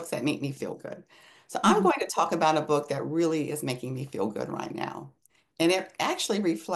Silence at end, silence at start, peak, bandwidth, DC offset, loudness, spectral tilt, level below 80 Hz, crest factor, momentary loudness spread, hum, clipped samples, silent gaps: 0 s; 0 s; -8 dBFS; 12.5 kHz; under 0.1%; -28 LUFS; -4.5 dB/octave; -72 dBFS; 20 dB; 13 LU; none; under 0.1%; none